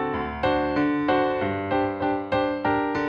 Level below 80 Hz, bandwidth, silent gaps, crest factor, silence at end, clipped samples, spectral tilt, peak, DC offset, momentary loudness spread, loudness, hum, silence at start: -46 dBFS; 6.6 kHz; none; 12 dB; 0 s; under 0.1%; -8 dB/octave; -12 dBFS; under 0.1%; 4 LU; -24 LUFS; none; 0 s